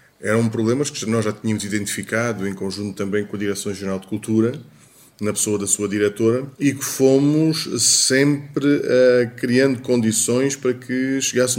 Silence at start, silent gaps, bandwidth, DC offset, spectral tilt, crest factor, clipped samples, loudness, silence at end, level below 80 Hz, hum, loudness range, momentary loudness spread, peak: 0.2 s; none; 16.5 kHz; under 0.1%; -4 dB/octave; 16 dB; under 0.1%; -19 LUFS; 0 s; -64 dBFS; none; 7 LU; 10 LU; -2 dBFS